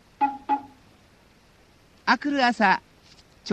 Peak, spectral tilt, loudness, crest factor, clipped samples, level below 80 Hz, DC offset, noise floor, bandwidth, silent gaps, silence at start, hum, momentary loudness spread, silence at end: -6 dBFS; -4.5 dB/octave; -24 LUFS; 22 dB; under 0.1%; -64 dBFS; under 0.1%; -57 dBFS; 9.6 kHz; none; 0.2 s; none; 9 LU; 0 s